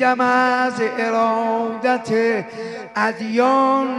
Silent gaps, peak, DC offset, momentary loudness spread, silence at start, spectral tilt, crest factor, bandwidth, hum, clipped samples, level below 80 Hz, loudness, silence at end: none; -4 dBFS; under 0.1%; 7 LU; 0 s; -5 dB/octave; 14 dB; 11.5 kHz; none; under 0.1%; -68 dBFS; -19 LUFS; 0 s